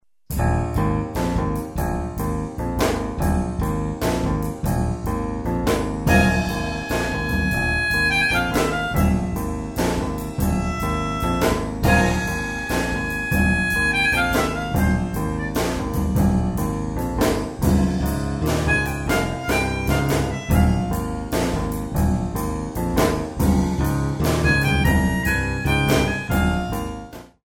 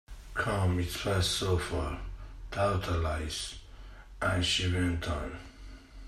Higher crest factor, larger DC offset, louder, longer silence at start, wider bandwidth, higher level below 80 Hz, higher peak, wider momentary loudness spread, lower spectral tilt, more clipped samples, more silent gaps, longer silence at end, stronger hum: about the same, 18 dB vs 16 dB; first, 0.1% vs under 0.1%; first, -21 LUFS vs -31 LUFS; first, 0.3 s vs 0.1 s; first, 18.5 kHz vs 14 kHz; first, -28 dBFS vs -44 dBFS; first, -4 dBFS vs -16 dBFS; second, 8 LU vs 21 LU; about the same, -5.5 dB/octave vs -4.5 dB/octave; neither; neither; first, 0.2 s vs 0 s; neither